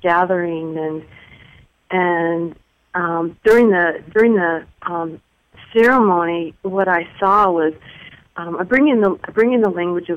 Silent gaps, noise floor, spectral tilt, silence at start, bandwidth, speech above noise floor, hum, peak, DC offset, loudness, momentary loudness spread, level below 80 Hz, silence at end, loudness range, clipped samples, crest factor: none; -48 dBFS; -7.5 dB/octave; 0.05 s; 12 kHz; 32 dB; none; -4 dBFS; under 0.1%; -17 LUFS; 13 LU; -52 dBFS; 0 s; 3 LU; under 0.1%; 14 dB